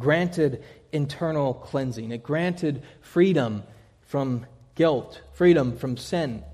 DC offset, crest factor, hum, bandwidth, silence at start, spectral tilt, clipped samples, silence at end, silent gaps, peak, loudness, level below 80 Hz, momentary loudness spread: under 0.1%; 18 dB; none; 13 kHz; 0 s; -7 dB/octave; under 0.1%; 0 s; none; -8 dBFS; -25 LUFS; -54 dBFS; 12 LU